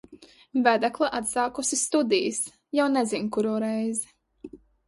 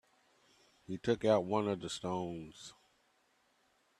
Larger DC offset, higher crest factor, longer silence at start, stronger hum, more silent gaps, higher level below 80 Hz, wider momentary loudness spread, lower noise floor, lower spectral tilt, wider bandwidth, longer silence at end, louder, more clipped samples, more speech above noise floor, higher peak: neither; about the same, 20 dB vs 22 dB; second, 0.1 s vs 0.9 s; neither; neither; first, -66 dBFS vs -72 dBFS; second, 7 LU vs 20 LU; second, -51 dBFS vs -74 dBFS; second, -3 dB/octave vs -5.5 dB/octave; second, 11.5 kHz vs 13 kHz; second, 0.3 s vs 1.3 s; first, -25 LUFS vs -35 LUFS; neither; second, 26 dB vs 39 dB; first, -6 dBFS vs -16 dBFS